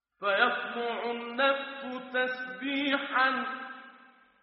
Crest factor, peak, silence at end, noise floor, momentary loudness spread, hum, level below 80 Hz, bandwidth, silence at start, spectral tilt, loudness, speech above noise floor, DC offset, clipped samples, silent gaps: 22 dB; -10 dBFS; 0.35 s; -58 dBFS; 12 LU; none; -84 dBFS; 5.8 kHz; 0.2 s; 0.5 dB/octave; -30 LUFS; 28 dB; under 0.1%; under 0.1%; none